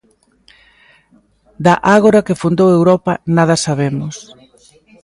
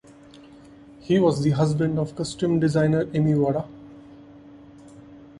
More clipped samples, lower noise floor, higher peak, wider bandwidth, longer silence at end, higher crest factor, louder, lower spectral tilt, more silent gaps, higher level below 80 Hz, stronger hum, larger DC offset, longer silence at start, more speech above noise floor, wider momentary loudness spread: neither; first, -53 dBFS vs -48 dBFS; first, 0 dBFS vs -6 dBFS; about the same, 11.5 kHz vs 11 kHz; first, 0.8 s vs 0.15 s; about the same, 14 dB vs 18 dB; first, -13 LUFS vs -22 LUFS; second, -6 dB/octave vs -7.5 dB/octave; neither; about the same, -50 dBFS vs -54 dBFS; neither; neither; first, 1.6 s vs 0.35 s; first, 41 dB vs 26 dB; about the same, 10 LU vs 9 LU